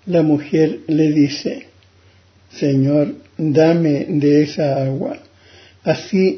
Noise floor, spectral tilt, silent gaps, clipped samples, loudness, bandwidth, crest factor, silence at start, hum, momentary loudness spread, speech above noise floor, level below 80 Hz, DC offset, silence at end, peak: -51 dBFS; -7.5 dB/octave; none; under 0.1%; -17 LUFS; 6.4 kHz; 14 dB; 0.05 s; none; 11 LU; 35 dB; -58 dBFS; under 0.1%; 0 s; -2 dBFS